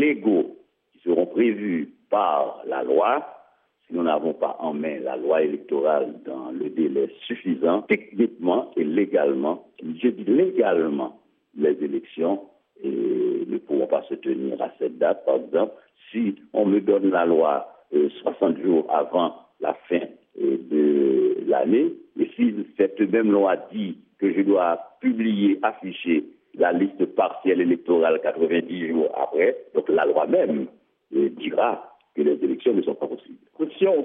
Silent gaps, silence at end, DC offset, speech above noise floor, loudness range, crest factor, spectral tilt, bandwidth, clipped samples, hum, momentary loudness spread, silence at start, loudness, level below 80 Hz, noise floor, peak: none; 0 s; under 0.1%; 37 dB; 3 LU; 16 dB; -5 dB/octave; 3.8 kHz; under 0.1%; none; 9 LU; 0 s; -23 LUFS; -82 dBFS; -59 dBFS; -6 dBFS